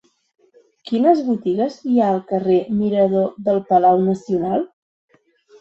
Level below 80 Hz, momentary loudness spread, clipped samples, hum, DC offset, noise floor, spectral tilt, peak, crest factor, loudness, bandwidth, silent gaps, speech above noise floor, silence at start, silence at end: -60 dBFS; 7 LU; under 0.1%; none; under 0.1%; -52 dBFS; -8.5 dB/octave; -2 dBFS; 16 dB; -18 LUFS; 7.8 kHz; none; 35 dB; 0.85 s; 0.95 s